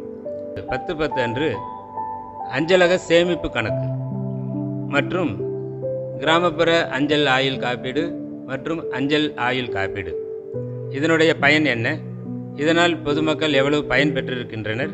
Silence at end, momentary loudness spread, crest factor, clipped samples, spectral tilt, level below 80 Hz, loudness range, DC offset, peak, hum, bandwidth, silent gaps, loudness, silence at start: 0 s; 13 LU; 20 dB; under 0.1%; -5.5 dB/octave; -50 dBFS; 4 LU; under 0.1%; 0 dBFS; none; 8.4 kHz; none; -21 LUFS; 0 s